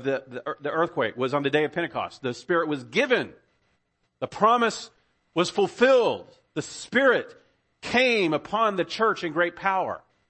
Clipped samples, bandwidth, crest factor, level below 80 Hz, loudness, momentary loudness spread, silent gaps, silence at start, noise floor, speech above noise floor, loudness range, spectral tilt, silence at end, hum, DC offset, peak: under 0.1%; 8.8 kHz; 20 dB; -66 dBFS; -24 LUFS; 14 LU; none; 0 s; -72 dBFS; 48 dB; 3 LU; -4.5 dB/octave; 0.3 s; none; under 0.1%; -6 dBFS